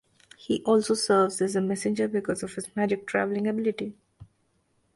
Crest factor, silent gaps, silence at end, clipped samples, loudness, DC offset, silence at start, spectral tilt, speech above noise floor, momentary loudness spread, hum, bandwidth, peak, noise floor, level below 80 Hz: 18 dB; none; 0.7 s; under 0.1%; -26 LUFS; under 0.1%; 0.4 s; -5 dB/octave; 44 dB; 10 LU; none; 11.5 kHz; -10 dBFS; -70 dBFS; -66 dBFS